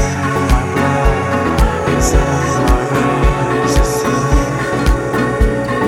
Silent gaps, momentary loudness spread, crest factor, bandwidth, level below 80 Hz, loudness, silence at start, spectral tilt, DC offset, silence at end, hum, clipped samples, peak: none; 2 LU; 14 dB; 15.5 kHz; -18 dBFS; -15 LUFS; 0 s; -5.5 dB/octave; under 0.1%; 0 s; none; under 0.1%; 0 dBFS